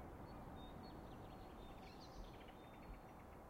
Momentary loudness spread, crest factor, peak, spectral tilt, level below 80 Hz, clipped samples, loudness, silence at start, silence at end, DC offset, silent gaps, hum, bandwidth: 3 LU; 14 dB; -42 dBFS; -6 dB/octave; -62 dBFS; under 0.1%; -57 LUFS; 0 s; 0 s; under 0.1%; none; none; 16 kHz